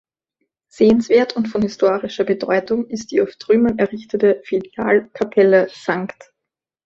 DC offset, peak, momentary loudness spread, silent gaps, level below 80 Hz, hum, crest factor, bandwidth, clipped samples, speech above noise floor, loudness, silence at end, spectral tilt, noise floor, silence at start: under 0.1%; -2 dBFS; 8 LU; none; -56 dBFS; none; 16 dB; 7.8 kHz; under 0.1%; 66 dB; -18 LUFS; 0.8 s; -6 dB/octave; -83 dBFS; 0.8 s